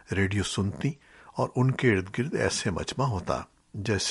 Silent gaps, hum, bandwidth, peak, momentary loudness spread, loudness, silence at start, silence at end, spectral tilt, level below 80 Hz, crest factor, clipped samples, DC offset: none; none; 11.5 kHz; -10 dBFS; 9 LU; -28 LUFS; 0.1 s; 0 s; -5 dB/octave; -52 dBFS; 18 dB; under 0.1%; under 0.1%